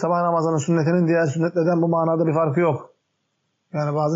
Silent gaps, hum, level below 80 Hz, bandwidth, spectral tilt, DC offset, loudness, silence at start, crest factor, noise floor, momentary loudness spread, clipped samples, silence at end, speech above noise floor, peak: none; none; -70 dBFS; 7.8 kHz; -8 dB/octave; under 0.1%; -20 LUFS; 0 s; 12 dB; -73 dBFS; 6 LU; under 0.1%; 0 s; 53 dB; -10 dBFS